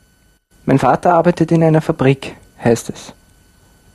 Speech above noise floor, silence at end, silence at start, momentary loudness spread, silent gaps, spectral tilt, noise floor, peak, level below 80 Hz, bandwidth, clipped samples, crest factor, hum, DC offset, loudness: 41 dB; 0.85 s; 0.65 s; 15 LU; none; -7 dB/octave; -54 dBFS; 0 dBFS; -46 dBFS; 12.5 kHz; under 0.1%; 16 dB; none; under 0.1%; -15 LUFS